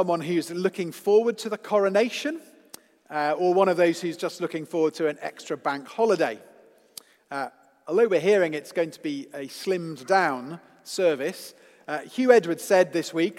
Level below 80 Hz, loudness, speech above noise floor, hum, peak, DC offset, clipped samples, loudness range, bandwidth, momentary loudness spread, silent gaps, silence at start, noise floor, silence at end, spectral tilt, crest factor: -84 dBFS; -25 LUFS; 26 dB; none; -2 dBFS; under 0.1%; under 0.1%; 4 LU; 16 kHz; 16 LU; none; 0 s; -51 dBFS; 0 s; -5 dB/octave; 22 dB